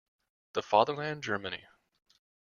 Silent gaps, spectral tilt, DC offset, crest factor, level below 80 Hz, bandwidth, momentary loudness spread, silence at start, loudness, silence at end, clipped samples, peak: none; -4.5 dB/octave; under 0.1%; 24 dB; -72 dBFS; 7.2 kHz; 13 LU; 0.55 s; -31 LUFS; 0.85 s; under 0.1%; -10 dBFS